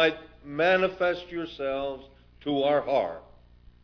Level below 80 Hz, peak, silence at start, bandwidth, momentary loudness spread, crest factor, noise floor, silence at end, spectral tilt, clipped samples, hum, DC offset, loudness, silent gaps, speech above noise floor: -56 dBFS; -8 dBFS; 0 s; 5.4 kHz; 15 LU; 20 dB; -54 dBFS; 0.6 s; -6 dB/octave; under 0.1%; 60 Hz at -60 dBFS; under 0.1%; -27 LUFS; none; 27 dB